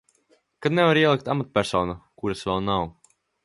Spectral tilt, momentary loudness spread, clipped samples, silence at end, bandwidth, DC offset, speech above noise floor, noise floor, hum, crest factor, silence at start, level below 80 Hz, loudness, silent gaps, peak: -6 dB/octave; 13 LU; under 0.1%; 0.55 s; 11.5 kHz; under 0.1%; 42 dB; -65 dBFS; none; 20 dB; 0.6 s; -50 dBFS; -23 LUFS; none; -6 dBFS